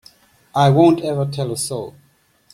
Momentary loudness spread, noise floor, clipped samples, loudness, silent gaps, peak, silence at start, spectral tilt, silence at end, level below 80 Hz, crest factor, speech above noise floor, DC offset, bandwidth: 14 LU; -55 dBFS; under 0.1%; -17 LUFS; none; -2 dBFS; 0.55 s; -6.5 dB/octave; 0.65 s; -56 dBFS; 18 dB; 38 dB; under 0.1%; 13 kHz